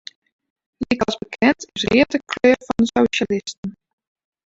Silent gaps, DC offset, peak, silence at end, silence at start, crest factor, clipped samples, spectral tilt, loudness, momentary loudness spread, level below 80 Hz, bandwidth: 3.57-3.63 s; under 0.1%; -2 dBFS; 0.8 s; 0.8 s; 20 dB; under 0.1%; -4.5 dB/octave; -19 LUFS; 13 LU; -50 dBFS; 7.8 kHz